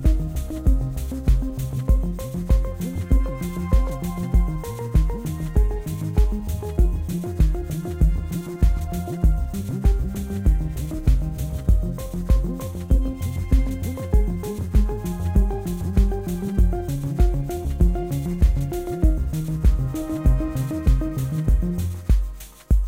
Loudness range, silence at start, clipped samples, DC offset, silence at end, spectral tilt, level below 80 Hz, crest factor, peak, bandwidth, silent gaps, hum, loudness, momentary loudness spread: 1 LU; 0 s; under 0.1%; under 0.1%; 0 s; -8 dB/octave; -22 dBFS; 16 dB; -6 dBFS; 16 kHz; none; none; -24 LUFS; 6 LU